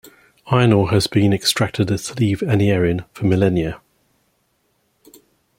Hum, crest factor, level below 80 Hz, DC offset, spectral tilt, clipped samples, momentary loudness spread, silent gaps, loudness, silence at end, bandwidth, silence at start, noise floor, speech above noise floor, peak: none; 18 dB; -46 dBFS; under 0.1%; -6 dB/octave; under 0.1%; 7 LU; none; -18 LUFS; 1.8 s; 16.5 kHz; 0.45 s; -65 dBFS; 49 dB; -2 dBFS